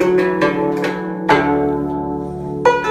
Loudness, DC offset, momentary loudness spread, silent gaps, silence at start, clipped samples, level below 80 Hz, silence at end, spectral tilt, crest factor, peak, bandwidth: -17 LUFS; under 0.1%; 9 LU; none; 0 s; under 0.1%; -42 dBFS; 0 s; -6.5 dB/octave; 16 dB; 0 dBFS; 13.5 kHz